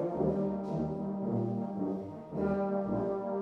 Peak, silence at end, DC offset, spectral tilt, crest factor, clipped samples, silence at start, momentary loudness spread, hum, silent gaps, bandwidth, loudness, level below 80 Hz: -20 dBFS; 0 s; under 0.1%; -11 dB/octave; 14 dB; under 0.1%; 0 s; 5 LU; none; none; 6 kHz; -34 LUFS; -58 dBFS